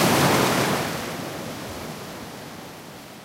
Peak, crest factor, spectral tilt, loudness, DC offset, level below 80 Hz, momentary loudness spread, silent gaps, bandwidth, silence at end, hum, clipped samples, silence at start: -6 dBFS; 18 dB; -4 dB/octave; -24 LUFS; under 0.1%; -52 dBFS; 20 LU; none; 16 kHz; 0 s; none; under 0.1%; 0 s